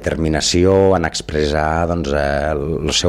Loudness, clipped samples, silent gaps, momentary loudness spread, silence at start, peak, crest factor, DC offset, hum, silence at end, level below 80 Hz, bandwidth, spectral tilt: -16 LUFS; under 0.1%; none; 7 LU; 0 s; -2 dBFS; 14 dB; under 0.1%; none; 0 s; -32 dBFS; 14 kHz; -4.5 dB/octave